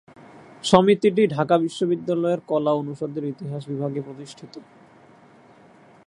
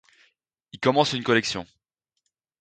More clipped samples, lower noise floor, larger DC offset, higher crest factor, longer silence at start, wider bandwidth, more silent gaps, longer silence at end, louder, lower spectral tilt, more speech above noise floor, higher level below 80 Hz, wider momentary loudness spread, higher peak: neither; second, -51 dBFS vs -80 dBFS; neither; about the same, 24 dB vs 22 dB; second, 0.35 s vs 0.75 s; first, 11 kHz vs 9.4 kHz; neither; first, 1.45 s vs 0.95 s; about the same, -22 LUFS vs -23 LUFS; first, -6 dB/octave vs -4.5 dB/octave; second, 29 dB vs 57 dB; about the same, -64 dBFS vs -62 dBFS; first, 19 LU vs 9 LU; first, 0 dBFS vs -4 dBFS